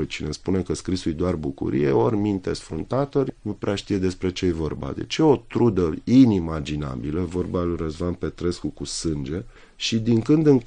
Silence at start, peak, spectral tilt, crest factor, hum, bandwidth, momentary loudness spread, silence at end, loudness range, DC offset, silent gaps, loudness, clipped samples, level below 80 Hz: 0 s; -4 dBFS; -6.5 dB/octave; 18 dB; none; 10 kHz; 10 LU; 0 s; 5 LU; under 0.1%; none; -23 LUFS; under 0.1%; -44 dBFS